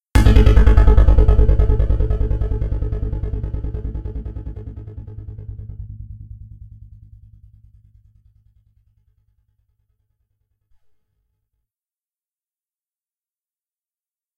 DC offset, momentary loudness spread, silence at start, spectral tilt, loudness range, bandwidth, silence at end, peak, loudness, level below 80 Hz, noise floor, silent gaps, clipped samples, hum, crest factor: under 0.1%; 22 LU; 0.15 s; -8 dB/octave; 24 LU; 8.6 kHz; 8.15 s; 0 dBFS; -18 LUFS; -20 dBFS; under -90 dBFS; none; under 0.1%; none; 18 dB